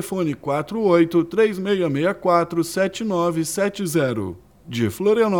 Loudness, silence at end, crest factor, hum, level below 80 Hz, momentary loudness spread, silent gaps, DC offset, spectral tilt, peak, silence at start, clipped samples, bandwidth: -21 LUFS; 0 s; 16 dB; none; -56 dBFS; 7 LU; none; under 0.1%; -5.5 dB/octave; -4 dBFS; 0 s; under 0.1%; 18.5 kHz